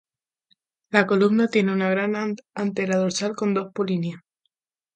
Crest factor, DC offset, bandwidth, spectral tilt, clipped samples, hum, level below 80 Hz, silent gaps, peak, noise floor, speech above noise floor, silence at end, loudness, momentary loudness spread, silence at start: 22 dB; under 0.1%; 9.2 kHz; -5.5 dB/octave; under 0.1%; none; -70 dBFS; none; 0 dBFS; -77 dBFS; 55 dB; 0.8 s; -23 LUFS; 9 LU; 0.9 s